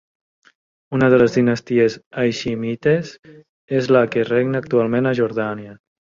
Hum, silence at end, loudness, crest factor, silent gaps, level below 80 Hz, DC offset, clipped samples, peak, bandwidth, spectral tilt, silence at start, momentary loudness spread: none; 0.4 s; -18 LUFS; 18 dB; 2.06-2.11 s, 3.19-3.23 s, 3.49-3.68 s; -56 dBFS; under 0.1%; under 0.1%; -2 dBFS; 7.6 kHz; -7 dB/octave; 0.9 s; 10 LU